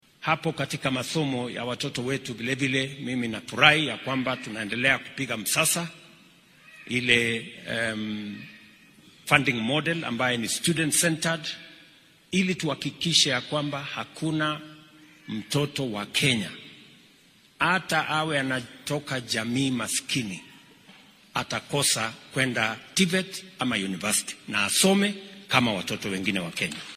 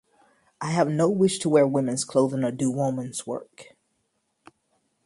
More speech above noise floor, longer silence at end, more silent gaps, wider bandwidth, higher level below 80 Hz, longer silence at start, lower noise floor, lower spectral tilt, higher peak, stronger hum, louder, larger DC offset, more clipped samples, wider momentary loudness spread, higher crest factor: second, 31 dB vs 50 dB; second, 0 s vs 1.45 s; neither; first, 15.5 kHz vs 11.5 kHz; about the same, -64 dBFS vs -68 dBFS; second, 0.2 s vs 0.6 s; second, -58 dBFS vs -74 dBFS; second, -3 dB/octave vs -5.5 dB/octave; first, 0 dBFS vs -6 dBFS; neither; about the same, -25 LUFS vs -24 LUFS; neither; neither; about the same, 11 LU vs 12 LU; first, 26 dB vs 18 dB